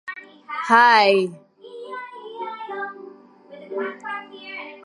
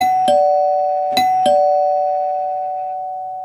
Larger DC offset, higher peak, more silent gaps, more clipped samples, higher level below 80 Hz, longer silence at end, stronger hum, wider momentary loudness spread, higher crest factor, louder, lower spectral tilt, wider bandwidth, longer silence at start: neither; about the same, -2 dBFS vs -4 dBFS; neither; neither; second, -84 dBFS vs -66 dBFS; about the same, 0.05 s vs 0 s; neither; first, 22 LU vs 10 LU; first, 22 dB vs 12 dB; second, -19 LUFS vs -16 LUFS; about the same, -4 dB/octave vs -3 dB/octave; second, 11.5 kHz vs 14.5 kHz; about the same, 0.05 s vs 0 s